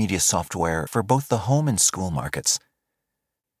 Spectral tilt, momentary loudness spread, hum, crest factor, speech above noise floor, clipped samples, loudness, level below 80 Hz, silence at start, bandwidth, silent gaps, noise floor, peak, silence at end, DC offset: -3.5 dB/octave; 6 LU; none; 20 dB; 60 dB; under 0.1%; -22 LUFS; -44 dBFS; 0 s; 16 kHz; none; -83 dBFS; -4 dBFS; 1 s; under 0.1%